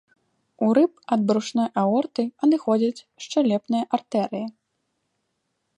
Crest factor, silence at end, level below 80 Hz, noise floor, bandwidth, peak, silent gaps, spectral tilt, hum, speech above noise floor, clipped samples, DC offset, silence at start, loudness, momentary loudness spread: 18 dB; 1.3 s; -76 dBFS; -76 dBFS; 10.5 kHz; -6 dBFS; none; -6.5 dB/octave; none; 53 dB; under 0.1%; under 0.1%; 0.6 s; -23 LUFS; 7 LU